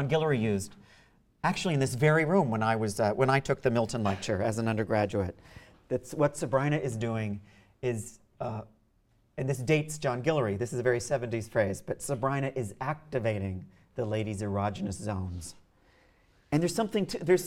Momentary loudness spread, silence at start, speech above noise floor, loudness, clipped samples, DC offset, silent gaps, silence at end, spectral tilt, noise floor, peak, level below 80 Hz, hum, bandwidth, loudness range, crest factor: 11 LU; 0 s; 38 dB; -30 LUFS; under 0.1%; under 0.1%; none; 0 s; -6 dB/octave; -68 dBFS; -10 dBFS; -58 dBFS; none; 16 kHz; 7 LU; 20 dB